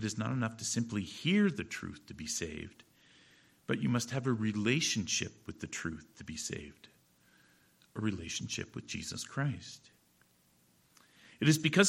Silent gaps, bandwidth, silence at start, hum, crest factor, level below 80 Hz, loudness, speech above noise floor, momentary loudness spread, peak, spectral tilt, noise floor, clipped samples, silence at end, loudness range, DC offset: none; 16.5 kHz; 0 s; none; 24 dB; -64 dBFS; -35 LUFS; 35 dB; 16 LU; -12 dBFS; -4 dB/octave; -69 dBFS; under 0.1%; 0 s; 7 LU; under 0.1%